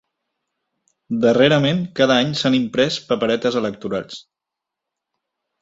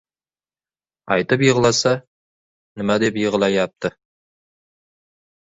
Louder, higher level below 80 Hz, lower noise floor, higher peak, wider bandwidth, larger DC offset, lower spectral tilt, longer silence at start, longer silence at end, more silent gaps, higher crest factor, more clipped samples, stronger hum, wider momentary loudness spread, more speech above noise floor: about the same, -18 LUFS vs -19 LUFS; about the same, -58 dBFS vs -56 dBFS; second, -84 dBFS vs under -90 dBFS; about the same, 0 dBFS vs -2 dBFS; about the same, 8 kHz vs 8 kHz; neither; about the same, -5.5 dB/octave vs -4.5 dB/octave; about the same, 1.1 s vs 1.05 s; second, 1.4 s vs 1.7 s; second, none vs 2.07-2.76 s; about the same, 20 dB vs 20 dB; neither; neither; about the same, 12 LU vs 11 LU; second, 66 dB vs over 72 dB